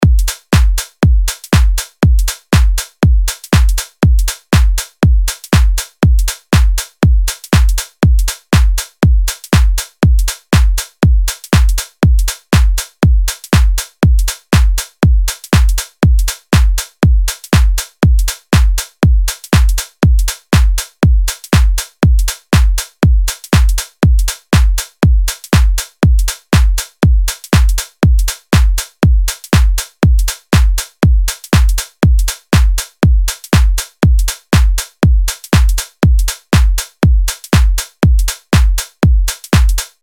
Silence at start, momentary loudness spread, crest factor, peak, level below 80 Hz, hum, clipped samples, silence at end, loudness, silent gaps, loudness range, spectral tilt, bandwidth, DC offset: 0 s; 3 LU; 10 dB; 0 dBFS; -12 dBFS; none; under 0.1%; 0.15 s; -13 LUFS; none; 0 LU; -5 dB/octave; 18.5 kHz; under 0.1%